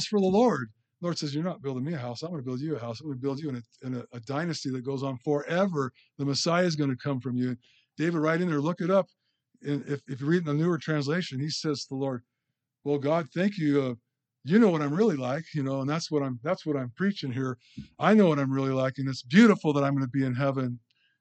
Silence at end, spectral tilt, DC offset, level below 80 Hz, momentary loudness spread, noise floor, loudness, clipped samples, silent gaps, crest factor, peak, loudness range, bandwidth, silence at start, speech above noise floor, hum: 0.4 s; -6.5 dB/octave; under 0.1%; -70 dBFS; 13 LU; -84 dBFS; -28 LUFS; under 0.1%; none; 22 dB; -6 dBFS; 8 LU; 8.8 kHz; 0 s; 57 dB; none